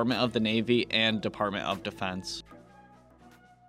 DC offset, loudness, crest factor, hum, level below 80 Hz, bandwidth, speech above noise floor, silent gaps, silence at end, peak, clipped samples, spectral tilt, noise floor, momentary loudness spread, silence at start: under 0.1%; -29 LUFS; 20 dB; none; -60 dBFS; 14 kHz; 27 dB; none; 1.05 s; -12 dBFS; under 0.1%; -5 dB/octave; -56 dBFS; 11 LU; 0 s